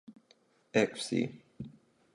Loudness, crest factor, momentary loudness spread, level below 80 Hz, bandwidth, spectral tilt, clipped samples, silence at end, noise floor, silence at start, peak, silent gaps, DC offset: -33 LUFS; 22 dB; 18 LU; -72 dBFS; 11.5 kHz; -5 dB/octave; under 0.1%; 0.45 s; -68 dBFS; 0.1 s; -14 dBFS; none; under 0.1%